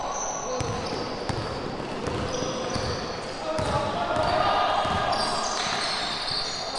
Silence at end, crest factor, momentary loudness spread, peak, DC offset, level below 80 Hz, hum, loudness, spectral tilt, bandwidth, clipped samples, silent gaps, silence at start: 0 s; 16 dB; 7 LU; -10 dBFS; under 0.1%; -46 dBFS; none; -27 LUFS; -3.5 dB/octave; 11.5 kHz; under 0.1%; none; 0 s